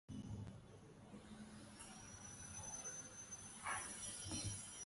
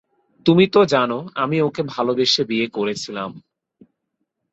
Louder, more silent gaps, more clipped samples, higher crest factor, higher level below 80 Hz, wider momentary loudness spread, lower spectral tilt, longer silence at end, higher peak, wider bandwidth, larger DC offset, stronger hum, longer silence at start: second, -50 LUFS vs -19 LUFS; neither; neither; about the same, 18 dB vs 18 dB; second, -66 dBFS vs -60 dBFS; about the same, 13 LU vs 12 LU; second, -2.5 dB/octave vs -5.5 dB/octave; second, 0 s vs 1.15 s; second, -34 dBFS vs -2 dBFS; first, 11.5 kHz vs 8.2 kHz; neither; neither; second, 0.1 s vs 0.45 s